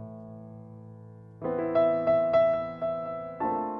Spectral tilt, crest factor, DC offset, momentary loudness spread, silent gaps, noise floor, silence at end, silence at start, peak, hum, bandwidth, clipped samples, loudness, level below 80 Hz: -9 dB/octave; 16 dB; under 0.1%; 23 LU; none; -47 dBFS; 0 s; 0 s; -14 dBFS; none; 5.6 kHz; under 0.1%; -27 LUFS; -62 dBFS